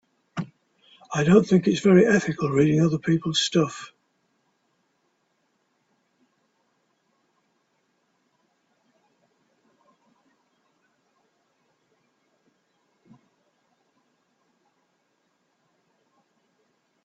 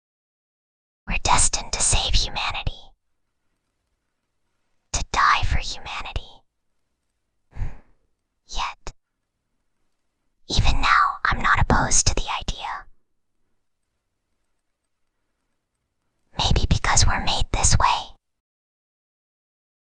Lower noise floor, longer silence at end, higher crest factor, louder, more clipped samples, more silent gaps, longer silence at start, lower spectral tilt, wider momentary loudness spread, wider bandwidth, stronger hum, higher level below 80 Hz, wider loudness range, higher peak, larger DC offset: second, -72 dBFS vs -76 dBFS; first, 13.2 s vs 1.8 s; about the same, 24 dB vs 22 dB; about the same, -21 LUFS vs -21 LUFS; neither; neither; second, 0.35 s vs 1.05 s; first, -6 dB/octave vs -2 dB/octave; about the same, 19 LU vs 17 LU; second, 8 kHz vs 10 kHz; neither; second, -64 dBFS vs -30 dBFS; second, 9 LU vs 16 LU; about the same, -4 dBFS vs -2 dBFS; neither